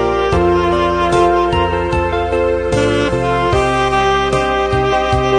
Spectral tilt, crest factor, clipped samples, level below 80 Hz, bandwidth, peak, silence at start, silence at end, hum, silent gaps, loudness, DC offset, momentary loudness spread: -6 dB/octave; 12 dB; under 0.1%; -28 dBFS; 10.5 kHz; -2 dBFS; 0 s; 0 s; none; none; -14 LUFS; under 0.1%; 3 LU